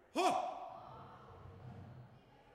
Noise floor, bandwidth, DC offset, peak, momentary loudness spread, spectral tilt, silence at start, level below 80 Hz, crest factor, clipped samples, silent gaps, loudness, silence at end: -62 dBFS; 15 kHz; under 0.1%; -20 dBFS; 21 LU; -4.5 dB/octave; 0.15 s; -72 dBFS; 22 dB; under 0.1%; none; -39 LUFS; 0 s